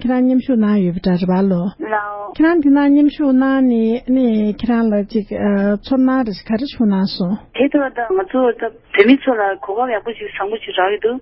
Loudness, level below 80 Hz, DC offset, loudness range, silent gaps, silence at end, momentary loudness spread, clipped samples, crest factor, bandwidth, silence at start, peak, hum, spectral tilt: -16 LUFS; -46 dBFS; under 0.1%; 3 LU; none; 0 s; 9 LU; under 0.1%; 16 dB; 5.8 kHz; 0 s; 0 dBFS; none; -10.5 dB/octave